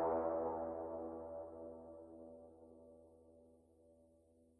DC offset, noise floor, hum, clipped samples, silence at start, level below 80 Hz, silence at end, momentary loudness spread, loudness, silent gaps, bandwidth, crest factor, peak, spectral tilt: under 0.1%; -71 dBFS; none; under 0.1%; 0 s; -72 dBFS; 0.55 s; 25 LU; -45 LUFS; none; 10.5 kHz; 18 dB; -28 dBFS; -10 dB/octave